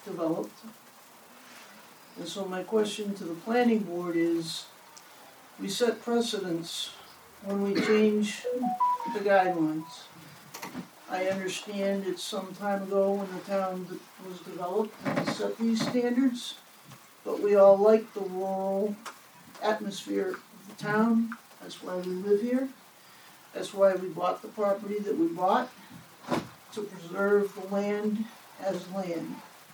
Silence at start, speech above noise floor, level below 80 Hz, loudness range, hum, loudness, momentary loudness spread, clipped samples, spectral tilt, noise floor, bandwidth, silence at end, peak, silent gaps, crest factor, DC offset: 0 s; 25 dB; -80 dBFS; 6 LU; none; -29 LUFS; 19 LU; under 0.1%; -5 dB/octave; -53 dBFS; over 20 kHz; 0 s; -10 dBFS; none; 20 dB; under 0.1%